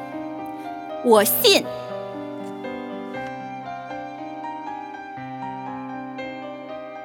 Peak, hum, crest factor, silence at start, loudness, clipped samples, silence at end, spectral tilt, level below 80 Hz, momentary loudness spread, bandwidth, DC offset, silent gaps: -2 dBFS; none; 24 dB; 0 s; -25 LUFS; under 0.1%; 0 s; -2.5 dB/octave; -66 dBFS; 18 LU; over 20 kHz; under 0.1%; none